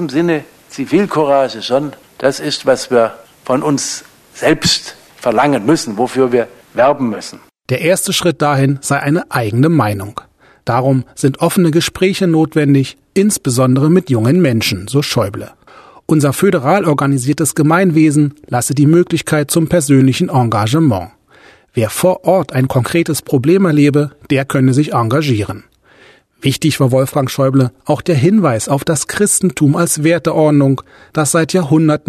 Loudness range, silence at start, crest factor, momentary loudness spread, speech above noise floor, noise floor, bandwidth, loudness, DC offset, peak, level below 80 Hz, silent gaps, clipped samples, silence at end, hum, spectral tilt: 3 LU; 0 s; 12 dB; 8 LU; 33 dB; -46 dBFS; 13.5 kHz; -13 LUFS; under 0.1%; 0 dBFS; -48 dBFS; none; under 0.1%; 0.1 s; none; -5.5 dB/octave